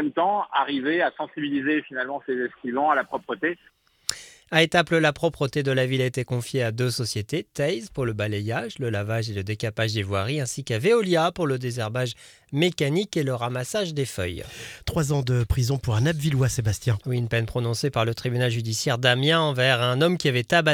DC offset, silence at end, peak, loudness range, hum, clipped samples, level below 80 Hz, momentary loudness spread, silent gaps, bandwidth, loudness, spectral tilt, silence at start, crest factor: under 0.1%; 0 s; -2 dBFS; 4 LU; none; under 0.1%; -46 dBFS; 9 LU; none; 16.5 kHz; -24 LUFS; -5 dB/octave; 0 s; 22 dB